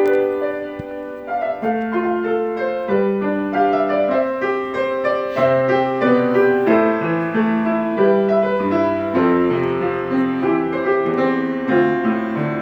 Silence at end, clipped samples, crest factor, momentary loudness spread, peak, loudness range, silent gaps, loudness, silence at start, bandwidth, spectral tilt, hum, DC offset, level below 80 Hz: 0 s; under 0.1%; 14 dB; 6 LU; -4 dBFS; 3 LU; none; -18 LUFS; 0 s; 6.6 kHz; -8.5 dB/octave; none; under 0.1%; -54 dBFS